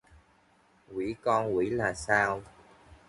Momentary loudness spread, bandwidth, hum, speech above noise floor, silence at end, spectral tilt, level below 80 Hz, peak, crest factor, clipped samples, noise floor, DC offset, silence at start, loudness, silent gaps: 11 LU; 11.5 kHz; none; 36 dB; 0.15 s; -5.5 dB/octave; -58 dBFS; -10 dBFS; 22 dB; under 0.1%; -64 dBFS; under 0.1%; 0.9 s; -29 LUFS; none